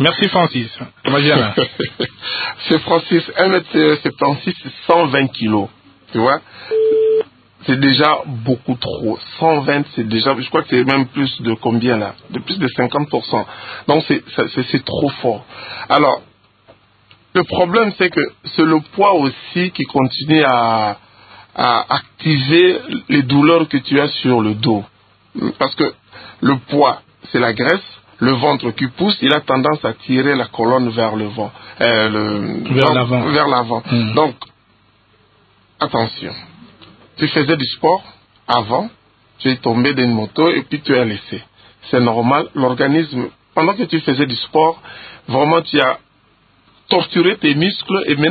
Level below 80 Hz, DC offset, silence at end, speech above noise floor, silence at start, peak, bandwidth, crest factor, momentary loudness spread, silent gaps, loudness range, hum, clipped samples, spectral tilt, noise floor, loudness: -52 dBFS; under 0.1%; 0 s; 39 dB; 0 s; 0 dBFS; 4.9 kHz; 16 dB; 9 LU; none; 4 LU; none; under 0.1%; -8.5 dB/octave; -54 dBFS; -16 LUFS